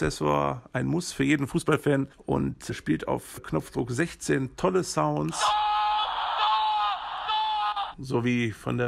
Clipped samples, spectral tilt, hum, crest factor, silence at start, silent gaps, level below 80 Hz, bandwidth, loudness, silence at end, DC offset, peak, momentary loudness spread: under 0.1%; -5 dB/octave; none; 18 dB; 0 s; none; -50 dBFS; 15 kHz; -27 LUFS; 0 s; under 0.1%; -8 dBFS; 7 LU